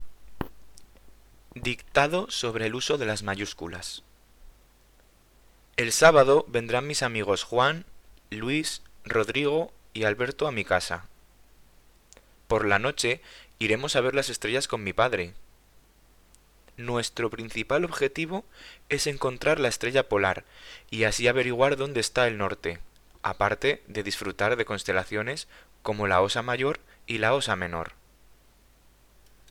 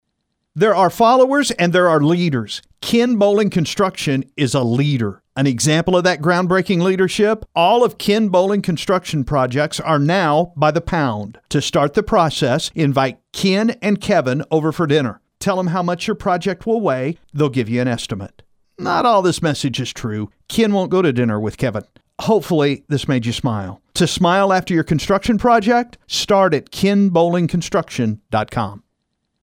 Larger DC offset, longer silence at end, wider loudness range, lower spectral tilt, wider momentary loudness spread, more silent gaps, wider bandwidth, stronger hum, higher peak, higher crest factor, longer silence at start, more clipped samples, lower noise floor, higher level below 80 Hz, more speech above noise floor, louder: neither; first, 1.6 s vs 0.65 s; first, 7 LU vs 4 LU; second, -3.5 dB/octave vs -5.5 dB/octave; first, 13 LU vs 8 LU; neither; first, 19 kHz vs 16.5 kHz; neither; about the same, 0 dBFS vs 0 dBFS; first, 28 dB vs 16 dB; second, 0 s vs 0.55 s; neither; second, -59 dBFS vs -73 dBFS; second, -52 dBFS vs -44 dBFS; second, 32 dB vs 56 dB; second, -26 LUFS vs -17 LUFS